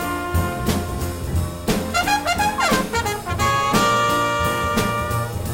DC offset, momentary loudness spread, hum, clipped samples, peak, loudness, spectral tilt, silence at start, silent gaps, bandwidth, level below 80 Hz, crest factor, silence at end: under 0.1%; 7 LU; none; under 0.1%; -4 dBFS; -20 LUFS; -4.5 dB/octave; 0 s; none; 16.5 kHz; -34 dBFS; 16 dB; 0 s